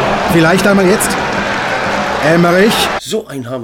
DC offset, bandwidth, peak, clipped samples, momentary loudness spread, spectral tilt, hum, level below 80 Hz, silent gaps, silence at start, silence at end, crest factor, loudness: under 0.1%; 18.5 kHz; 0 dBFS; under 0.1%; 8 LU; -4.5 dB/octave; none; -38 dBFS; none; 0 s; 0 s; 12 dB; -12 LUFS